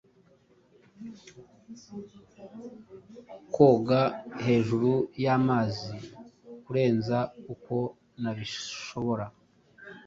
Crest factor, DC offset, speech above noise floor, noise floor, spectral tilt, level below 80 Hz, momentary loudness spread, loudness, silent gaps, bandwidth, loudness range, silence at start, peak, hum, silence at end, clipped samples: 22 dB; under 0.1%; 34 dB; -62 dBFS; -7 dB/octave; -64 dBFS; 25 LU; -27 LUFS; none; 7.6 kHz; 8 LU; 1 s; -6 dBFS; none; 0.05 s; under 0.1%